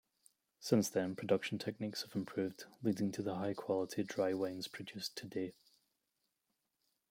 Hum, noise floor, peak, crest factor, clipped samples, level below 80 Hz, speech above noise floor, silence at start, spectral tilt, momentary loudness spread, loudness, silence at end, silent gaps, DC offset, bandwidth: none; -86 dBFS; -16 dBFS; 22 dB; under 0.1%; -80 dBFS; 47 dB; 0.6 s; -5 dB/octave; 9 LU; -39 LUFS; 1.6 s; none; under 0.1%; 16.5 kHz